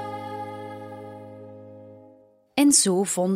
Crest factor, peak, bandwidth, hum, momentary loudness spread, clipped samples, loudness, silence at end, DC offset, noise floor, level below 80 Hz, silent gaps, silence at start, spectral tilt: 22 dB; -4 dBFS; 15.5 kHz; none; 26 LU; under 0.1%; -21 LUFS; 0 s; under 0.1%; -55 dBFS; -72 dBFS; none; 0 s; -3.5 dB/octave